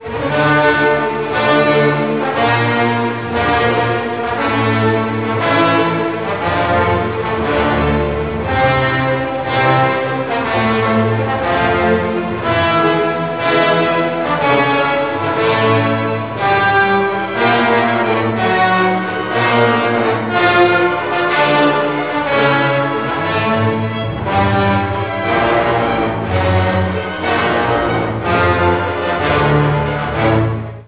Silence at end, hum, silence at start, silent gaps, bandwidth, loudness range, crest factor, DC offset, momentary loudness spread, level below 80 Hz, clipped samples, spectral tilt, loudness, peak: 0.05 s; none; 0 s; none; 4 kHz; 2 LU; 14 dB; 0.5%; 6 LU; -34 dBFS; under 0.1%; -10 dB/octave; -14 LUFS; 0 dBFS